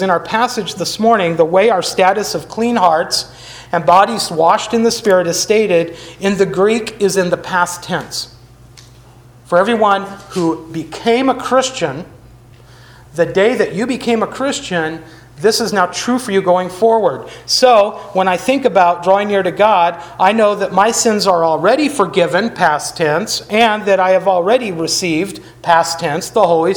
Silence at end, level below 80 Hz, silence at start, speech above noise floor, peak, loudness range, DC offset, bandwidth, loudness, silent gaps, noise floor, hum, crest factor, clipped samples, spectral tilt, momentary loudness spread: 0 s; -50 dBFS; 0 s; 28 dB; 0 dBFS; 5 LU; under 0.1%; over 20 kHz; -14 LUFS; none; -41 dBFS; none; 14 dB; under 0.1%; -3.5 dB/octave; 8 LU